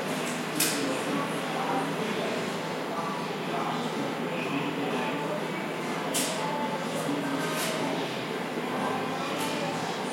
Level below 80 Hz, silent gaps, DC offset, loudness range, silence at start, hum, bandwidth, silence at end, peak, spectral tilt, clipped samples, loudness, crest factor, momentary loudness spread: -76 dBFS; none; under 0.1%; 1 LU; 0 s; none; 16.5 kHz; 0 s; -12 dBFS; -3.5 dB/octave; under 0.1%; -30 LUFS; 18 dB; 4 LU